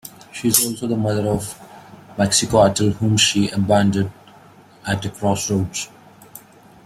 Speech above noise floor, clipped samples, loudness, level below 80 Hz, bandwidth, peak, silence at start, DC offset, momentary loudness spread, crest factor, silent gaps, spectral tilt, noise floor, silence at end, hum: 28 dB; under 0.1%; -18 LUFS; -48 dBFS; 16.5 kHz; 0 dBFS; 0.05 s; under 0.1%; 16 LU; 20 dB; none; -4 dB/octave; -47 dBFS; 0.5 s; none